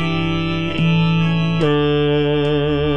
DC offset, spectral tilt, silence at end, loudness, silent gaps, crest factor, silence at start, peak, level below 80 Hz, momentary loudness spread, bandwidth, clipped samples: 3%; -8 dB/octave; 0 s; -17 LUFS; none; 10 dB; 0 s; -6 dBFS; -38 dBFS; 4 LU; 6.2 kHz; under 0.1%